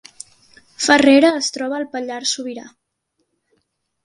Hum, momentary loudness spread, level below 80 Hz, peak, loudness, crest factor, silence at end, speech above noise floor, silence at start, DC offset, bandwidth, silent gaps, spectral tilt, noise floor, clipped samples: none; 19 LU; -62 dBFS; 0 dBFS; -16 LUFS; 20 dB; 1.35 s; 55 dB; 0.8 s; under 0.1%; 11.5 kHz; none; -2 dB/octave; -72 dBFS; under 0.1%